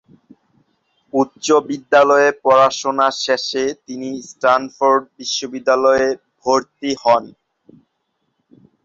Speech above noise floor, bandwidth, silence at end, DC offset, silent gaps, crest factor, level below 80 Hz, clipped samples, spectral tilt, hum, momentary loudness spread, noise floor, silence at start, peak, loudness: 54 dB; 7.8 kHz; 1.55 s; under 0.1%; none; 16 dB; -60 dBFS; under 0.1%; -3 dB/octave; none; 10 LU; -70 dBFS; 1.15 s; -2 dBFS; -16 LUFS